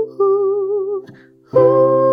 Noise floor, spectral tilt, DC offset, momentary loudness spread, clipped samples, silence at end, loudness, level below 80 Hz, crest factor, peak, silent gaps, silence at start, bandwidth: -43 dBFS; -11 dB/octave; under 0.1%; 11 LU; under 0.1%; 0 s; -15 LUFS; -62 dBFS; 14 dB; -2 dBFS; none; 0 s; 4.9 kHz